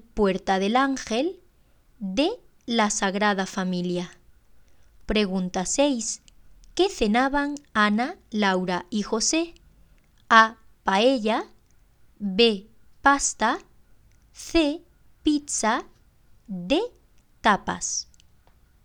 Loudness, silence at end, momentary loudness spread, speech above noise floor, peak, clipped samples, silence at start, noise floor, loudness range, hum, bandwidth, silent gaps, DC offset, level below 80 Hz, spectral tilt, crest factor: -24 LUFS; 0.8 s; 13 LU; 35 dB; 0 dBFS; under 0.1%; 0.15 s; -59 dBFS; 4 LU; none; 15.5 kHz; none; under 0.1%; -48 dBFS; -3.5 dB/octave; 26 dB